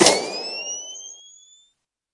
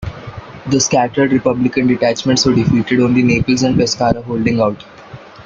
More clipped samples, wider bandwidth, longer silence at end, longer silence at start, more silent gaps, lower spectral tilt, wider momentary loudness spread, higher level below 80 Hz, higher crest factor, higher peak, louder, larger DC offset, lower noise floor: neither; first, 12 kHz vs 7.6 kHz; first, 0.95 s vs 0.05 s; about the same, 0 s vs 0 s; neither; second, -1.5 dB/octave vs -5 dB/octave; first, 21 LU vs 9 LU; second, -64 dBFS vs -40 dBFS; first, 24 dB vs 14 dB; about the same, 0 dBFS vs -2 dBFS; second, -24 LUFS vs -14 LUFS; neither; first, -68 dBFS vs -35 dBFS